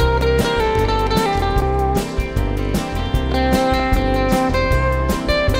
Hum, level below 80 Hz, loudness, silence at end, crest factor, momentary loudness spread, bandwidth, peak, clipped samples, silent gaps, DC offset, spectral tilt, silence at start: none; -22 dBFS; -18 LUFS; 0 s; 14 dB; 5 LU; 16 kHz; -4 dBFS; under 0.1%; none; under 0.1%; -6 dB/octave; 0 s